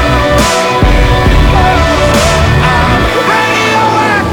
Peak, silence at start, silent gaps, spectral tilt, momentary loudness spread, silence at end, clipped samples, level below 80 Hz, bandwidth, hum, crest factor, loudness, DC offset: 0 dBFS; 0 s; none; -5 dB/octave; 1 LU; 0 s; under 0.1%; -14 dBFS; 20 kHz; none; 8 dB; -8 LUFS; under 0.1%